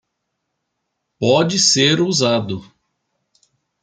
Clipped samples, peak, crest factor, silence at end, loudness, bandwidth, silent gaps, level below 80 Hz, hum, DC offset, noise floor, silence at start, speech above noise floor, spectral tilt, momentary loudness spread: under 0.1%; -2 dBFS; 18 dB; 1.2 s; -15 LUFS; 11 kHz; none; -60 dBFS; none; under 0.1%; -75 dBFS; 1.2 s; 59 dB; -3.5 dB/octave; 12 LU